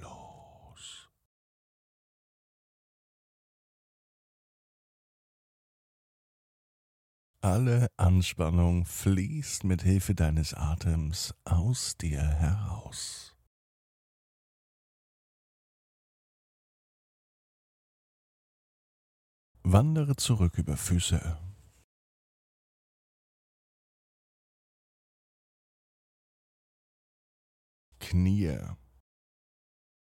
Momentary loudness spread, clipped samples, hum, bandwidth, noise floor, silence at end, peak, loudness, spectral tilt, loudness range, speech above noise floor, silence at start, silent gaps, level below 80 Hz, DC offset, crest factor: 16 LU; under 0.1%; none; 16.5 kHz; -54 dBFS; 1.3 s; -8 dBFS; -29 LUFS; -5.5 dB/octave; 10 LU; 26 dB; 0 s; 1.25-7.34 s, 13.47-19.55 s, 21.84-27.92 s; -44 dBFS; under 0.1%; 26 dB